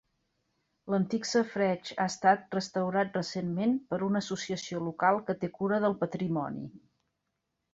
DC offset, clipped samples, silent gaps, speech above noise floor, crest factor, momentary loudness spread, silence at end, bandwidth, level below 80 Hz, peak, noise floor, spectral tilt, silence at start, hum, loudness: under 0.1%; under 0.1%; none; 53 dB; 22 dB; 7 LU; 0.95 s; 8 kHz; -70 dBFS; -10 dBFS; -83 dBFS; -5.5 dB/octave; 0.85 s; none; -30 LUFS